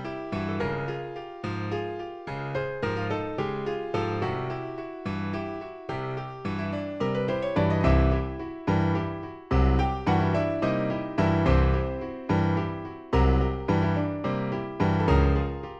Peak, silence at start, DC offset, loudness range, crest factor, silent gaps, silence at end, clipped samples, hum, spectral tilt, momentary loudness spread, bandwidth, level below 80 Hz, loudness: -8 dBFS; 0 s; under 0.1%; 6 LU; 18 dB; none; 0 s; under 0.1%; none; -8.5 dB/octave; 12 LU; 7.2 kHz; -34 dBFS; -27 LUFS